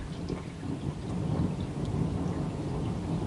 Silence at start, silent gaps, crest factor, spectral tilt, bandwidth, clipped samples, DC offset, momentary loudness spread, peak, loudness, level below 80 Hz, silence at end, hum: 0 s; none; 14 dB; -8 dB/octave; 11.5 kHz; under 0.1%; under 0.1%; 6 LU; -18 dBFS; -33 LUFS; -46 dBFS; 0 s; none